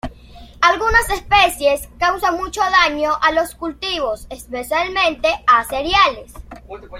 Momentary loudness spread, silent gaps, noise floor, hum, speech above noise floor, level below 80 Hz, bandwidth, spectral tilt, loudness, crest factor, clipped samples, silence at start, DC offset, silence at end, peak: 14 LU; none; -40 dBFS; 60 Hz at -45 dBFS; 23 dB; -36 dBFS; 16.5 kHz; -2.5 dB/octave; -16 LUFS; 18 dB; under 0.1%; 0.05 s; under 0.1%; 0 s; 0 dBFS